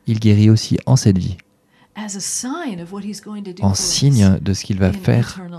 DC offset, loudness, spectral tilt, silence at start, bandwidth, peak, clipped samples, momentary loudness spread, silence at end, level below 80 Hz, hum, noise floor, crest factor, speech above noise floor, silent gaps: under 0.1%; -16 LUFS; -5.5 dB/octave; 0.05 s; 13.5 kHz; 0 dBFS; under 0.1%; 16 LU; 0 s; -44 dBFS; none; -55 dBFS; 16 dB; 39 dB; none